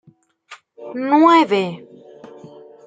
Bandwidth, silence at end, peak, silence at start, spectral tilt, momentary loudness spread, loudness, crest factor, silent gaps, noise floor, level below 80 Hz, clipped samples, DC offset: 7.8 kHz; 1.1 s; -2 dBFS; 0.5 s; -6 dB/octave; 24 LU; -15 LUFS; 18 dB; none; -47 dBFS; -74 dBFS; under 0.1%; under 0.1%